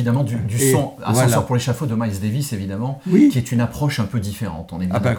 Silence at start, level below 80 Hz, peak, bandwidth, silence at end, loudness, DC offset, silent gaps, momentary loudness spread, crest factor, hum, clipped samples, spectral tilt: 0 s; -48 dBFS; -4 dBFS; over 20 kHz; 0 s; -19 LUFS; under 0.1%; none; 10 LU; 16 dB; none; under 0.1%; -6 dB/octave